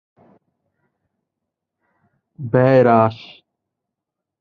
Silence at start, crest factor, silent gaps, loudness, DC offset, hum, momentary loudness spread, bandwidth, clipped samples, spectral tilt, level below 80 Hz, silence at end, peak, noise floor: 2.4 s; 20 dB; none; -15 LUFS; under 0.1%; none; 21 LU; 5.6 kHz; under 0.1%; -10 dB/octave; -58 dBFS; 1.25 s; 0 dBFS; -83 dBFS